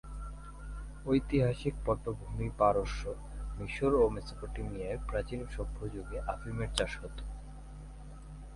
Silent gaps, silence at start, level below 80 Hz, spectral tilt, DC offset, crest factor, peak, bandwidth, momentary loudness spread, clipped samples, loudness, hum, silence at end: none; 0.05 s; -42 dBFS; -6.5 dB/octave; under 0.1%; 24 dB; -12 dBFS; 11.5 kHz; 19 LU; under 0.1%; -34 LUFS; none; 0 s